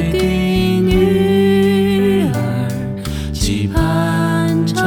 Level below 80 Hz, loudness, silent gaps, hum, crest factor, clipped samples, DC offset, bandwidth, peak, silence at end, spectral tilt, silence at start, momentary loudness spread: -28 dBFS; -15 LUFS; none; none; 12 dB; under 0.1%; under 0.1%; 18 kHz; -2 dBFS; 0 s; -6.5 dB/octave; 0 s; 8 LU